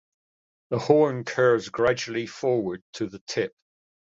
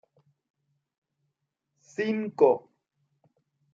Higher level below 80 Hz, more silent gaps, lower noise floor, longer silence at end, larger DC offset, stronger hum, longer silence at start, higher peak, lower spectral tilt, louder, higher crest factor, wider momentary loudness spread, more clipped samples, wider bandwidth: first, -62 dBFS vs -84 dBFS; first, 2.82-2.93 s, 3.21-3.27 s vs none; first, under -90 dBFS vs -82 dBFS; second, 0.65 s vs 1.15 s; neither; neither; second, 0.7 s vs 2 s; about the same, -6 dBFS vs -8 dBFS; about the same, -5.5 dB/octave vs -6.5 dB/octave; about the same, -25 LUFS vs -26 LUFS; about the same, 20 dB vs 24 dB; about the same, 12 LU vs 10 LU; neither; about the same, 7.8 kHz vs 7.6 kHz